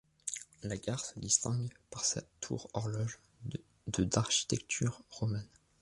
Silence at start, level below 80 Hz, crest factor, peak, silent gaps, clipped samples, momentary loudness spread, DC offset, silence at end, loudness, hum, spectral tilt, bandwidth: 0.25 s; -58 dBFS; 24 dB; -14 dBFS; none; under 0.1%; 14 LU; under 0.1%; 0.35 s; -36 LUFS; none; -3.5 dB/octave; 11.5 kHz